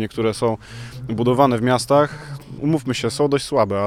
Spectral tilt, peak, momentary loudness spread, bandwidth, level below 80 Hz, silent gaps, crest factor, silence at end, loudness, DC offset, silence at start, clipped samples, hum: -6 dB/octave; -2 dBFS; 16 LU; 15.5 kHz; -48 dBFS; none; 18 dB; 0 s; -19 LUFS; under 0.1%; 0 s; under 0.1%; none